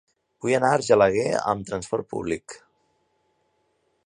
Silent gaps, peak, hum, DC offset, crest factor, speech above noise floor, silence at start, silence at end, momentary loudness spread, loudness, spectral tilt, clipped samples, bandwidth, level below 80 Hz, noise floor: none; -4 dBFS; none; under 0.1%; 22 dB; 47 dB; 0.45 s; 1.5 s; 13 LU; -23 LUFS; -5 dB/octave; under 0.1%; 11 kHz; -56 dBFS; -70 dBFS